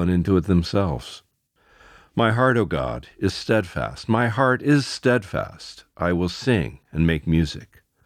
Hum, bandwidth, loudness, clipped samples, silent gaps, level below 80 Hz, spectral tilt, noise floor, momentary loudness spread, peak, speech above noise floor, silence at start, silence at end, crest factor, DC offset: none; 13.5 kHz; -22 LUFS; under 0.1%; none; -40 dBFS; -6.5 dB/octave; -61 dBFS; 11 LU; -4 dBFS; 40 dB; 0 s; 0.4 s; 18 dB; under 0.1%